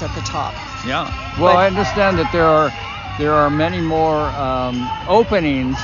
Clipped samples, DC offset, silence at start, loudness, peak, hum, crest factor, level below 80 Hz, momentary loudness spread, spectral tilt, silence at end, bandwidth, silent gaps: under 0.1%; under 0.1%; 0 s; -17 LUFS; -2 dBFS; none; 16 dB; -34 dBFS; 10 LU; -4.5 dB/octave; 0 s; 7.4 kHz; none